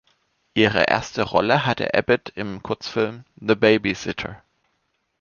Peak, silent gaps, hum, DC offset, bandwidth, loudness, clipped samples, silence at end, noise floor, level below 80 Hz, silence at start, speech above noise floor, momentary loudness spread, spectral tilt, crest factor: -2 dBFS; none; none; under 0.1%; 7.2 kHz; -21 LUFS; under 0.1%; 0.85 s; -71 dBFS; -52 dBFS; 0.55 s; 50 dB; 13 LU; -5.5 dB/octave; 20 dB